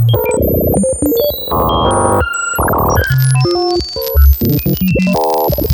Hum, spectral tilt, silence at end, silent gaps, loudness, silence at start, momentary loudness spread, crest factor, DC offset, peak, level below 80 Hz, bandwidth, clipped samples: none; -5.5 dB/octave; 0 s; none; -13 LUFS; 0 s; 3 LU; 12 dB; under 0.1%; 0 dBFS; -20 dBFS; 17.5 kHz; under 0.1%